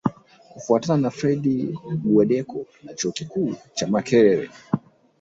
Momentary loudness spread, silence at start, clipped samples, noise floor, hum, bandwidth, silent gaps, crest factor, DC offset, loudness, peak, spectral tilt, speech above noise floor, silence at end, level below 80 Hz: 11 LU; 0.05 s; under 0.1%; -40 dBFS; none; 8 kHz; none; 18 dB; under 0.1%; -22 LUFS; -4 dBFS; -6 dB/octave; 19 dB; 0.45 s; -60 dBFS